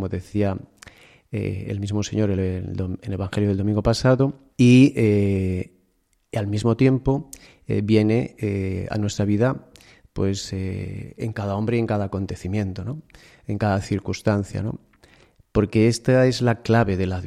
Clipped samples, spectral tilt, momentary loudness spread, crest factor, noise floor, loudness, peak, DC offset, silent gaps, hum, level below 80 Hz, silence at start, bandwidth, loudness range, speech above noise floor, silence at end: under 0.1%; -7 dB/octave; 13 LU; 18 dB; -66 dBFS; -22 LUFS; -4 dBFS; under 0.1%; none; none; -46 dBFS; 0 s; 12.5 kHz; 7 LU; 45 dB; 0 s